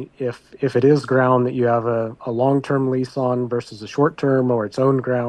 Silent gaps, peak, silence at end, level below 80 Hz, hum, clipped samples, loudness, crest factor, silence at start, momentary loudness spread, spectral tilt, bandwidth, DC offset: none; -4 dBFS; 0 s; -60 dBFS; none; under 0.1%; -20 LUFS; 14 dB; 0 s; 10 LU; -8 dB/octave; 10 kHz; under 0.1%